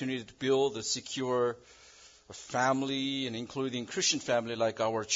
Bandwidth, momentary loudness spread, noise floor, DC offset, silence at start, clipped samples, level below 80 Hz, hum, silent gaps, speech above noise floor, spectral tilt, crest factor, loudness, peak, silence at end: 7.8 kHz; 8 LU; -56 dBFS; under 0.1%; 0 s; under 0.1%; -72 dBFS; none; none; 25 dB; -3 dB/octave; 18 dB; -31 LUFS; -14 dBFS; 0 s